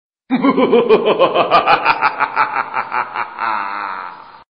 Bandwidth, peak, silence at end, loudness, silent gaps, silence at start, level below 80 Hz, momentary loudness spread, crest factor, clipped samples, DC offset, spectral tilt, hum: 5.6 kHz; 0 dBFS; 0.15 s; -15 LUFS; none; 0.3 s; -56 dBFS; 11 LU; 16 dB; under 0.1%; 0.1%; -7 dB/octave; none